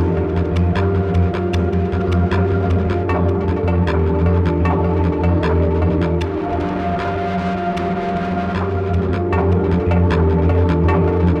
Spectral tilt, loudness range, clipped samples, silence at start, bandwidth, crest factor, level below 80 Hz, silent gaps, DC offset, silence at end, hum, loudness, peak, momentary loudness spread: -9 dB/octave; 3 LU; under 0.1%; 0 s; 6.2 kHz; 10 dB; -26 dBFS; none; under 0.1%; 0 s; none; -18 LUFS; -6 dBFS; 5 LU